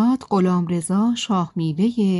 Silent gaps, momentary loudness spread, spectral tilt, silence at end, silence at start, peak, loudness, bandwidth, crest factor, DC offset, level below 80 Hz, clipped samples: none; 3 LU; -6.5 dB/octave; 0 s; 0 s; -8 dBFS; -20 LUFS; 11.5 kHz; 12 dB; under 0.1%; -60 dBFS; under 0.1%